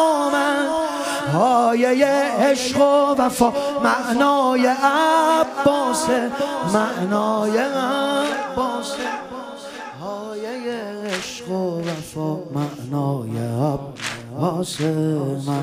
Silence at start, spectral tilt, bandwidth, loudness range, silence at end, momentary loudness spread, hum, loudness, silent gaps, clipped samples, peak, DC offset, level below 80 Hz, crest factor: 0 s; -5 dB/octave; 15.5 kHz; 10 LU; 0 s; 12 LU; none; -20 LUFS; none; under 0.1%; -2 dBFS; under 0.1%; -56 dBFS; 18 dB